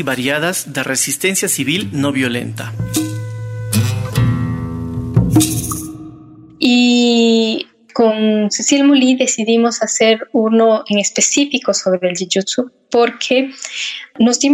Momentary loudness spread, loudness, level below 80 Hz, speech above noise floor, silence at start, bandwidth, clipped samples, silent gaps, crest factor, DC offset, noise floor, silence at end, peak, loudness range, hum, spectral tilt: 12 LU; -15 LUFS; -40 dBFS; 24 dB; 0 s; 16 kHz; under 0.1%; none; 14 dB; under 0.1%; -39 dBFS; 0 s; -2 dBFS; 5 LU; none; -4 dB/octave